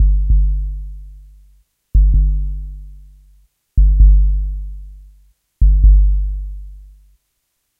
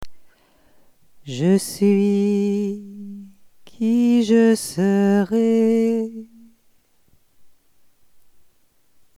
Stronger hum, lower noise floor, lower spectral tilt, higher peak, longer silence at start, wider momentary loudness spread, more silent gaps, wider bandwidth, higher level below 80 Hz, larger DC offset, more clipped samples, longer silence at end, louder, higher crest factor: neither; first, -70 dBFS vs -57 dBFS; first, -11.5 dB/octave vs -6.5 dB/octave; first, 0 dBFS vs -6 dBFS; about the same, 0 s vs 0 s; first, 22 LU vs 18 LU; neither; second, 0.4 kHz vs 14.5 kHz; first, -14 dBFS vs -60 dBFS; neither; neither; second, 1 s vs 1.7 s; first, -16 LUFS vs -19 LUFS; about the same, 14 dB vs 16 dB